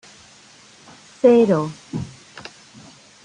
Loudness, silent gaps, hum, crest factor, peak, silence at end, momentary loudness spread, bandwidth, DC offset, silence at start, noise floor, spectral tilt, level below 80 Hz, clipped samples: -18 LUFS; none; none; 20 dB; -2 dBFS; 0.85 s; 25 LU; 10 kHz; under 0.1%; 1.25 s; -48 dBFS; -7 dB/octave; -60 dBFS; under 0.1%